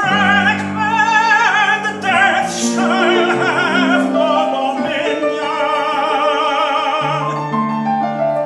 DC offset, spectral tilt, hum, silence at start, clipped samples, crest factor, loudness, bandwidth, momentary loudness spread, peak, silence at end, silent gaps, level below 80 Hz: under 0.1%; -4 dB/octave; none; 0 s; under 0.1%; 14 dB; -15 LUFS; 12.5 kHz; 6 LU; -2 dBFS; 0 s; none; -62 dBFS